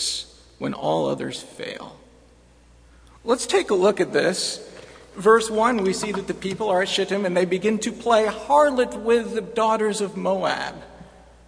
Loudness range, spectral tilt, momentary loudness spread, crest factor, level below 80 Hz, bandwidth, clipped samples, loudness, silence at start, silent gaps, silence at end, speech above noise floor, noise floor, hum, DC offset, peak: 5 LU; -4 dB/octave; 16 LU; 20 dB; -54 dBFS; 10.5 kHz; under 0.1%; -22 LUFS; 0 s; none; 0.4 s; 31 dB; -53 dBFS; none; under 0.1%; -2 dBFS